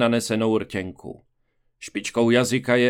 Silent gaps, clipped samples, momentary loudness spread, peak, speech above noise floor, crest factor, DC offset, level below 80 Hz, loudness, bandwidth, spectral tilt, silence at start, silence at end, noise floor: none; under 0.1%; 21 LU; -4 dBFS; 46 dB; 18 dB; under 0.1%; -60 dBFS; -22 LUFS; 16 kHz; -5 dB/octave; 0 s; 0 s; -68 dBFS